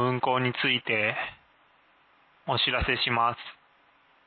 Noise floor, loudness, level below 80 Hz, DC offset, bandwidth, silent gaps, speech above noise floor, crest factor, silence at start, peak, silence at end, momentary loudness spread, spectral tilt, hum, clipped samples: -62 dBFS; -26 LUFS; -48 dBFS; under 0.1%; 4.7 kHz; none; 35 dB; 18 dB; 0 s; -12 dBFS; 0.75 s; 14 LU; -9 dB/octave; none; under 0.1%